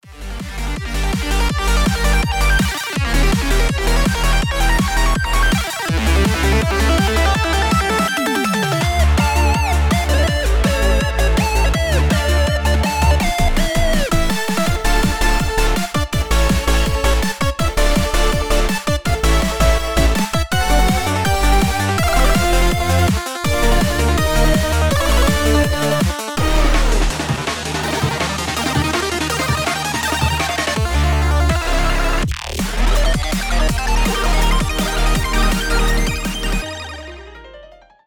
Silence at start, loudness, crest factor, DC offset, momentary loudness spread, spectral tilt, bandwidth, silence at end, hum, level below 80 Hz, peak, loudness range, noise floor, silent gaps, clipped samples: 0 s; -17 LUFS; 14 dB; under 0.1%; 5 LU; -4.5 dB/octave; 20 kHz; 0 s; none; -18 dBFS; -2 dBFS; 2 LU; -42 dBFS; none; under 0.1%